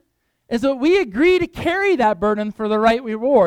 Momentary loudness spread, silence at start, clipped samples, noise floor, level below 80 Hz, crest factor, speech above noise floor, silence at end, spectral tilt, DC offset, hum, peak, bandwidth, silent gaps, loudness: 5 LU; 0.5 s; under 0.1%; -61 dBFS; -46 dBFS; 14 dB; 44 dB; 0 s; -6 dB/octave; under 0.1%; none; -2 dBFS; 12.5 kHz; none; -18 LUFS